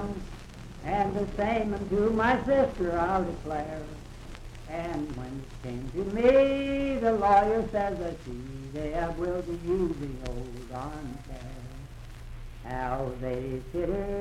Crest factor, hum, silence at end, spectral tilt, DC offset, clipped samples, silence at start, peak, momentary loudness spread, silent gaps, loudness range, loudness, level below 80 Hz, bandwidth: 18 dB; none; 0 s; -7 dB/octave; under 0.1%; under 0.1%; 0 s; -10 dBFS; 21 LU; none; 10 LU; -29 LUFS; -42 dBFS; 13.5 kHz